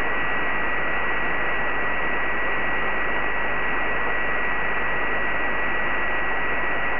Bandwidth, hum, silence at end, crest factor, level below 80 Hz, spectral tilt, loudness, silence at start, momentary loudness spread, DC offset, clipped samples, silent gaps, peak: 5.4 kHz; none; 0 s; 12 dB; -42 dBFS; -7.5 dB/octave; -24 LUFS; 0 s; 0 LU; 7%; under 0.1%; none; -12 dBFS